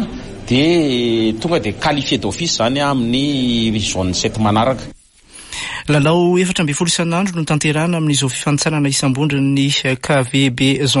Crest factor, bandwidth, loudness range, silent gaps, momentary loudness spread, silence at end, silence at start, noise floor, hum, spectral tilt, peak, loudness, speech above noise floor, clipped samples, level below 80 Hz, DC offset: 12 dB; 11.5 kHz; 2 LU; none; 5 LU; 0 s; 0 s; -41 dBFS; none; -4.5 dB/octave; -4 dBFS; -16 LUFS; 26 dB; under 0.1%; -40 dBFS; under 0.1%